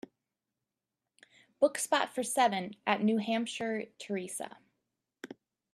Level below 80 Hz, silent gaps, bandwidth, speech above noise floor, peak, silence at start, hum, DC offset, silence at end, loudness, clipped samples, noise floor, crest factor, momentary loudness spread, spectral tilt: -82 dBFS; none; 14 kHz; 57 dB; -12 dBFS; 1.6 s; none; under 0.1%; 0.4 s; -32 LUFS; under 0.1%; -89 dBFS; 22 dB; 19 LU; -3.5 dB/octave